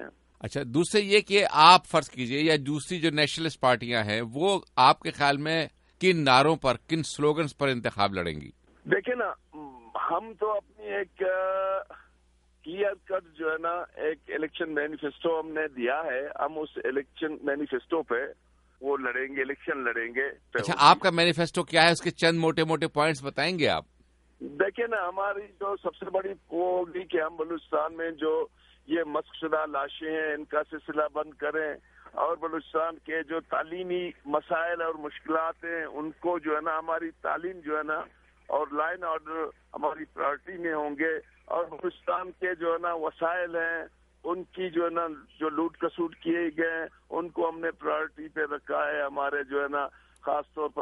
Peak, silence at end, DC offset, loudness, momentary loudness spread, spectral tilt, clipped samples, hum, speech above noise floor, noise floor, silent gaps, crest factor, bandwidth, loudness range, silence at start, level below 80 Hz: -2 dBFS; 0 s; under 0.1%; -28 LUFS; 12 LU; -4.5 dB/octave; under 0.1%; none; 36 dB; -64 dBFS; none; 26 dB; 11.5 kHz; 8 LU; 0 s; -62 dBFS